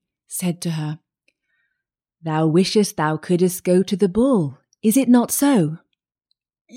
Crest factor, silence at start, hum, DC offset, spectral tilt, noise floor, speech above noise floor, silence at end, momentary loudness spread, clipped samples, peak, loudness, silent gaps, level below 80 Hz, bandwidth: 16 dB; 0.3 s; none; under 0.1%; -5.5 dB/octave; -80 dBFS; 62 dB; 0 s; 13 LU; under 0.1%; -4 dBFS; -19 LUFS; 6.61-6.65 s; -56 dBFS; 16.5 kHz